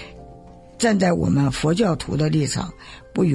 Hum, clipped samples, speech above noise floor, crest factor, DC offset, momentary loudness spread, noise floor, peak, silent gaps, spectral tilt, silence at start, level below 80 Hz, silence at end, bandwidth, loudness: none; under 0.1%; 23 dB; 16 dB; under 0.1%; 13 LU; -43 dBFS; -6 dBFS; none; -6 dB/octave; 0 s; -44 dBFS; 0 s; 11.5 kHz; -21 LUFS